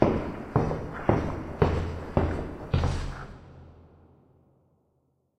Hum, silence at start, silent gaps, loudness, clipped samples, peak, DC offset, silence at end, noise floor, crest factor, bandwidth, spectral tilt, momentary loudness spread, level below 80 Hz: none; 0 s; none; -29 LUFS; under 0.1%; -4 dBFS; under 0.1%; 1.6 s; -71 dBFS; 24 dB; 9.4 kHz; -8 dB/octave; 14 LU; -38 dBFS